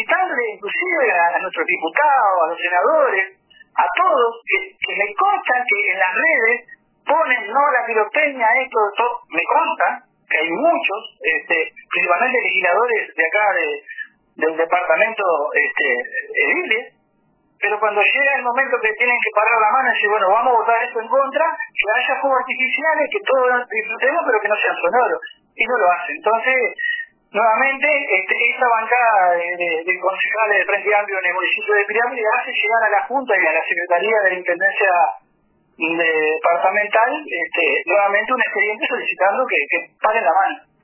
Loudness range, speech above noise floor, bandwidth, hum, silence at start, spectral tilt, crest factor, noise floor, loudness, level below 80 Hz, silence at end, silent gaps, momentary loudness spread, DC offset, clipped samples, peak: 2 LU; 44 dB; 3.2 kHz; none; 0 s; -5.5 dB/octave; 18 dB; -61 dBFS; -17 LUFS; -72 dBFS; 0.25 s; none; 6 LU; under 0.1%; under 0.1%; 0 dBFS